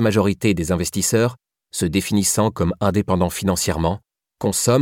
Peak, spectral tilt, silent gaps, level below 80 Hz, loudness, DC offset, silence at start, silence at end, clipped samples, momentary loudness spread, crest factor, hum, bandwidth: -4 dBFS; -5 dB/octave; none; -40 dBFS; -20 LUFS; under 0.1%; 0 s; 0 s; under 0.1%; 6 LU; 16 dB; none; 17.5 kHz